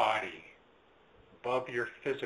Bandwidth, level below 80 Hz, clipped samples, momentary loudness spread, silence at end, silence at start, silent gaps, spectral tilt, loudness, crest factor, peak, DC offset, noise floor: 11.5 kHz; -72 dBFS; under 0.1%; 16 LU; 0 s; 0 s; none; -4.5 dB/octave; -35 LUFS; 22 dB; -14 dBFS; under 0.1%; -64 dBFS